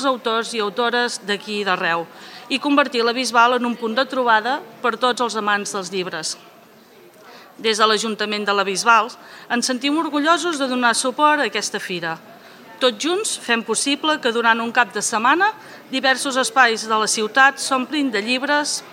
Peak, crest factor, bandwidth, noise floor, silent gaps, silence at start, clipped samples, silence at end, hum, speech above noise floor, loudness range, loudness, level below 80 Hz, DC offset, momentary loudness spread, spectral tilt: -2 dBFS; 18 dB; 16.5 kHz; -47 dBFS; none; 0 s; under 0.1%; 0 s; none; 28 dB; 4 LU; -19 LUFS; -82 dBFS; under 0.1%; 9 LU; -2 dB/octave